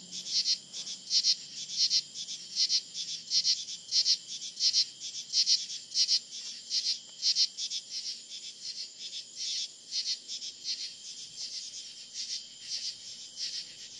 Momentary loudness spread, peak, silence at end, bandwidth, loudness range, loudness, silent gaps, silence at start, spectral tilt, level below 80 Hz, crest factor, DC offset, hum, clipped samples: 14 LU; -10 dBFS; 0 s; 12 kHz; 9 LU; -30 LUFS; none; 0 s; 3 dB/octave; -90 dBFS; 24 dB; under 0.1%; none; under 0.1%